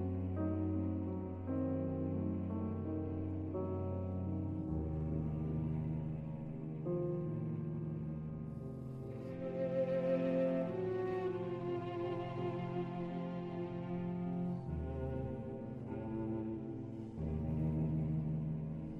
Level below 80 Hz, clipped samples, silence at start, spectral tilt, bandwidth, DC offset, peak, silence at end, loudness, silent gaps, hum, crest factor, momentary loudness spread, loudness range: -54 dBFS; under 0.1%; 0 s; -10.5 dB/octave; 5.2 kHz; under 0.1%; -24 dBFS; 0 s; -40 LUFS; none; none; 14 dB; 8 LU; 4 LU